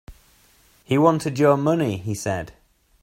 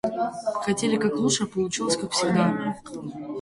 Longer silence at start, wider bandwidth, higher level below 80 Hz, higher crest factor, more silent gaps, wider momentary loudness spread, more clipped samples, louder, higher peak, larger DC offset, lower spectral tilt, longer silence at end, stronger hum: about the same, 0.1 s vs 0.05 s; first, 16 kHz vs 11.5 kHz; first, -54 dBFS vs -60 dBFS; about the same, 20 dB vs 16 dB; neither; about the same, 10 LU vs 12 LU; neither; first, -21 LUFS vs -25 LUFS; first, -4 dBFS vs -8 dBFS; neither; first, -6.5 dB/octave vs -4 dB/octave; first, 0.5 s vs 0 s; neither